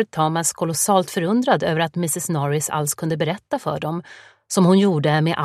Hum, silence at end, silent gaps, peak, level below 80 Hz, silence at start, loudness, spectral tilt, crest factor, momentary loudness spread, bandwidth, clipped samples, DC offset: none; 0 s; none; -2 dBFS; -62 dBFS; 0 s; -20 LUFS; -5 dB/octave; 18 dB; 9 LU; 15.5 kHz; under 0.1%; under 0.1%